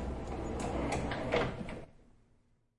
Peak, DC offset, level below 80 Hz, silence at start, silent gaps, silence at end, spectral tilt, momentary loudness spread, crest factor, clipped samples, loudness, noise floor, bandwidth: -16 dBFS; under 0.1%; -46 dBFS; 0 s; none; 0.75 s; -5.5 dB/octave; 12 LU; 20 dB; under 0.1%; -37 LUFS; -70 dBFS; 11.5 kHz